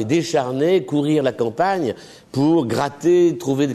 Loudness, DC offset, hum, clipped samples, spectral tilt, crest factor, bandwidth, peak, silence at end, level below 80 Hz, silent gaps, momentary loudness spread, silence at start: -19 LUFS; under 0.1%; none; under 0.1%; -6.5 dB/octave; 12 dB; 13.5 kHz; -6 dBFS; 0 s; -60 dBFS; none; 7 LU; 0 s